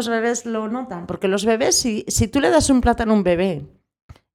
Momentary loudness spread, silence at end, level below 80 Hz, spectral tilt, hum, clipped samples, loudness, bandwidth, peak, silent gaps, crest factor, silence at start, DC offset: 10 LU; 0.7 s; -36 dBFS; -4 dB/octave; none; under 0.1%; -19 LUFS; 16.5 kHz; -4 dBFS; none; 16 dB; 0 s; under 0.1%